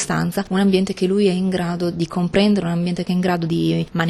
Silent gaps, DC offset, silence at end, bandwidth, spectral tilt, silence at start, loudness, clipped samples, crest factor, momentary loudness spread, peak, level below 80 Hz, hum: none; under 0.1%; 0 s; 13 kHz; -6 dB/octave; 0 s; -19 LUFS; under 0.1%; 14 dB; 5 LU; -4 dBFS; -46 dBFS; none